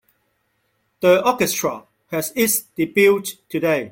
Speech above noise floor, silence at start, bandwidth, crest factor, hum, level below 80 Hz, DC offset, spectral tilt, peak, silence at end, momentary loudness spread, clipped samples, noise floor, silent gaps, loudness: 50 dB; 1 s; 17 kHz; 18 dB; none; -60 dBFS; under 0.1%; -3.5 dB/octave; -2 dBFS; 0 s; 11 LU; under 0.1%; -68 dBFS; none; -19 LUFS